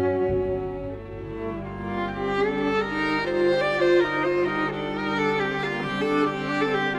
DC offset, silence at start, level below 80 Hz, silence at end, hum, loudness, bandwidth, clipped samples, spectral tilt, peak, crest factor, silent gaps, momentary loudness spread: under 0.1%; 0 s; -46 dBFS; 0 s; 50 Hz at -60 dBFS; -25 LUFS; 10.5 kHz; under 0.1%; -6.5 dB/octave; -10 dBFS; 14 dB; none; 11 LU